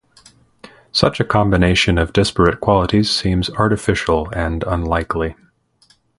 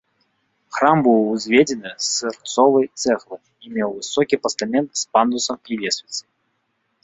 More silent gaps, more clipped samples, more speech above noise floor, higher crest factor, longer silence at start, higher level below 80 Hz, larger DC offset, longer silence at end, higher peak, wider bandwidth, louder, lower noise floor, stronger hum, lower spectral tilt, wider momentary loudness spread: neither; neither; second, 40 dB vs 51 dB; about the same, 18 dB vs 20 dB; first, 0.95 s vs 0.7 s; first, -30 dBFS vs -64 dBFS; neither; about the same, 0.85 s vs 0.85 s; about the same, 0 dBFS vs 0 dBFS; first, 11.5 kHz vs 8.2 kHz; about the same, -17 LUFS vs -19 LUFS; second, -56 dBFS vs -70 dBFS; neither; first, -5.5 dB/octave vs -3.5 dB/octave; second, 7 LU vs 11 LU